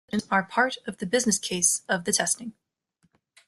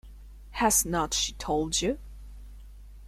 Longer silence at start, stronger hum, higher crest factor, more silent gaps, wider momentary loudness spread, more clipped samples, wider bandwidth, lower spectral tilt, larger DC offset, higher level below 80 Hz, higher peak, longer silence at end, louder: about the same, 0.15 s vs 0.05 s; neither; about the same, 20 dB vs 20 dB; neither; second, 7 LU vs 25 LU; neither; second, 12.5 kHz vs 16 kHz; about the same, -2 dB/octave vs -2.5 dB/octave; neither; second, -66 dBFS vs -44 dBFS; first, -6 dBFS vs -10 dBFS; first, 0.95 s vs 0 s; about the same, -25 LUFS vs -26 LUFS